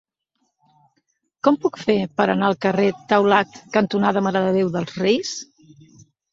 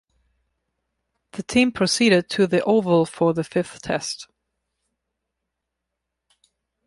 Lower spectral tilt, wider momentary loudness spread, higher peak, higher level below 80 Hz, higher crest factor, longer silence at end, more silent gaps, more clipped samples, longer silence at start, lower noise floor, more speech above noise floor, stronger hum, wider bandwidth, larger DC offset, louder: about the same, -5.5 dB/octave vs -4.5 dB/octave; second, 5 LU vs 12 LU; first, -2 dBFS vs -6 dBFS; about the same, -62 dBFS vs -58 dBFS; about the same, 20 dB vs 18 dB; second, 0.9 s vs 2.65 s; neither; neither; about the same, 1.45 s vs 1.35 s; second, -72 dBFS vs -81 dBFS; second, 53 dB vs 61 dB; neither; second, 7.8 kHz vs 11.5 kHz; neither; about the same, -20 LUFS vs -20 LUFS